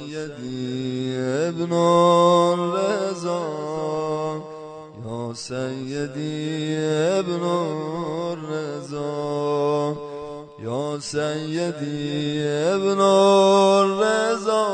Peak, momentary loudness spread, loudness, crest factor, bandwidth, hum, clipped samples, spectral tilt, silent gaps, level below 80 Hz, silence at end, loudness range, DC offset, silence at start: -4 dBFS; 15 LU; -22 LUFS; 18 dB; 9.4 kHz; none; under 0.1%; -5.5 dB/octave; none; -64 dBFS; 0 s; 8 LU; under 0.1%; 0 s